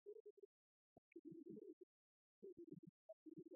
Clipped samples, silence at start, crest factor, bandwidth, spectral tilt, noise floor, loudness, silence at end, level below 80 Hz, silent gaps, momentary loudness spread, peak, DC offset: under 0.1%; 0.05 s; 16 dB; 1 kHz; 2.5 dB/octave; under -90 dBFS; -63 LUFS; 0 s; under -90 dBFS; 0.20-0.37 s, 0.45-1.12 s, 1.19-1.25 s, 1.73-2.42 s, 2.52-2.57 s, 2.79-2.83 s, 2.89-3.26 s; 8 LU; -46 dBFS; under 0.1%